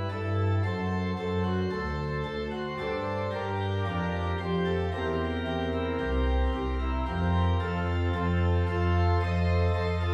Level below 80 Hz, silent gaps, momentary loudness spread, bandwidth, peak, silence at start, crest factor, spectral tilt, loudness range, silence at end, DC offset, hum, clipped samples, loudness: -36 dBFS; none; 5 LU; 7.4 kHz; -16 dBFS; 0 s; 12 dB; -8 dB/octave; 4 LU; 0 s; under 0.1%; none; under 0.1%; -29 LUFS